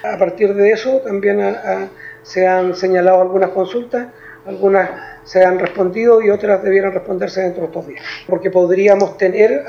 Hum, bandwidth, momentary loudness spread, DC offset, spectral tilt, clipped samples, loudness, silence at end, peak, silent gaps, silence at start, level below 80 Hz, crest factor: none; 7 kHz; 13 LU; under 0.1%; -6.5 dB/octave; under 0.1%; -15 LUFS; 0 s; 0 dBFS; none; 0 s; -56 dBFS; 14 dB